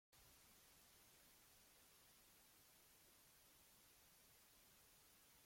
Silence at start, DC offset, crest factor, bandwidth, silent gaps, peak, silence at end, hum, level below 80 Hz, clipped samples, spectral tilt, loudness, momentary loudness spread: 0.1 s; under 0.1%; 14 dB; 16.5 kHz; none; -58 dBFS; 0 s; none; -86 dBFS; under 0.1%; -1.5 dB/octave; -69 LUFS; 1 LU